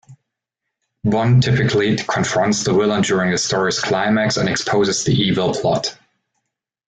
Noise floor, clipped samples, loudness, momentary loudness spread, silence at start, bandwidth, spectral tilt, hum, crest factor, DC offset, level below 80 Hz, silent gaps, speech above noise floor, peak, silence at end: -80 dBFS; under 0.1%; -17 LUFS; 4 LU; 0.1 s; 9.4 kHz; -4.5 dB/octave; none; 14 dB; under 0.1%; -50 dBFS; none; 64 dB; -4 dBFS; 0.95 s